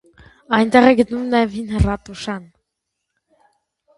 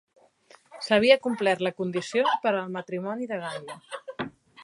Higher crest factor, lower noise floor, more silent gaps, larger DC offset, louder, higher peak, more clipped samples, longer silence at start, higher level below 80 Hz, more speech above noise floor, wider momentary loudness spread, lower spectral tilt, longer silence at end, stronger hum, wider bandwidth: about the same, 20 dB vs 24 dB; first, -78 dBFS vs -57 dBFS; neither; neither; first, -17 LUFS vs -26 LUFS; first, 0 dBFS vs -4 dBFS; neither; second, 0.5 s vs 0.7 s; first, -34 dBFS vs -68 dBFS; first, 61 dB vs 32 dB; about the same, 16 LU vs 18 LU; first, -6.5 dB/octave vs -5 dB/octave; first, 1.55 s vs 0 s; neither; about the same, 11.5 kHz vs 11.5 kHz